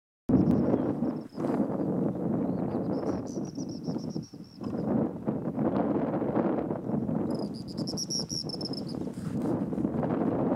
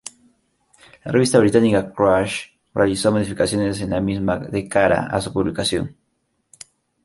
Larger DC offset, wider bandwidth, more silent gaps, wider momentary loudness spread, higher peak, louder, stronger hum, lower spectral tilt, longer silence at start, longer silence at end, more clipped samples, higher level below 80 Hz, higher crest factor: neither; about the same, 12.5 kHz vs 11.5 kHz; neither; second, 8 LU vs 11 LU; second, -12 dBFS vs -2 dBFS; second, -31 LUFS vs -19 LUFS; neither; about the same, -6.5 dB/octave vs -5.5 dB/octave; second, 0.3 s vs 1.05 s; second, 0 s vs 1.15 s; neither; second, -56 dBFS vs -46 dBFS; about the same, 18 dB vs 18 dB